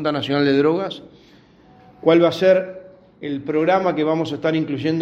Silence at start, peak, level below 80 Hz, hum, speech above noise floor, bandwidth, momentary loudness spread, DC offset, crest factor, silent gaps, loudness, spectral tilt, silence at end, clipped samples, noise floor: 0 s; -2 dBFS; -62 dBFS; none; 31 dB; 8 kHz; 15 LU; under 0.1%; 18 dB; none; -19 LUFS; -7 dB/octave; 0 s; under 0.1%; -50 dBFS